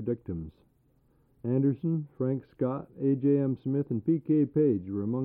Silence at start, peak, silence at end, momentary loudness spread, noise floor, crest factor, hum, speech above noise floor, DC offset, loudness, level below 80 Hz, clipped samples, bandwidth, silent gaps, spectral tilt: 0 s; -16 dBFS; 0 s; 9 LU; -66 dBFS; 14 dB; none; 38 dB; under 0.1%; -29 LUFS; -60 dBFS; under 0.1%; 3.4 kHz; none; -13.5 dB/octave